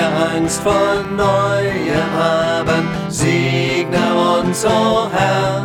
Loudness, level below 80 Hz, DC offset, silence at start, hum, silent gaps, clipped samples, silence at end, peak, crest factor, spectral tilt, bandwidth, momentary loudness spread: -16 LUFS; -40 dBFS; under 0.1%; 0 s; none; none; under 0.1%; 0 s; -2 dBFS; 14 dB; -5 dB/octave; 17.5 kHz; 3 LU